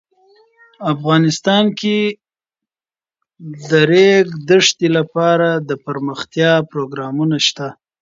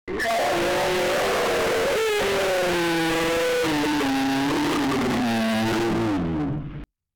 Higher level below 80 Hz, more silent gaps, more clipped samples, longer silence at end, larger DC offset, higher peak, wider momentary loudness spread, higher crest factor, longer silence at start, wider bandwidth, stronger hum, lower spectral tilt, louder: second, -62 dBFS vs -46 dBFS; neither; neither; about the same, 0.3 s vs 0.3 s; neither; first, 0 dBFS vs -20 dBFS; first, 12 LU vs 3 LU; first, 16 dB vs 2 dB; first, 0.8 s vs 0.05 s; second, 7.8 kHz vs over 20 kHz; neither; about the same, -4.5 dB/octave vs -4.5 dB/octave; first, -15 LUFS vs -23 LUFS